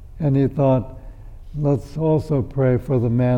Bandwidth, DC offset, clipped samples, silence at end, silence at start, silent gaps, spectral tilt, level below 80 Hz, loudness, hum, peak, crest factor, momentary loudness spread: 6.4 kHz; under 0.1%; under 0.1%; 0 s; 0 s; none; -10.5 dB/octave; -38 dBFS; -20 LUFS; none; -6 dBFS; 14 dB; 6 LU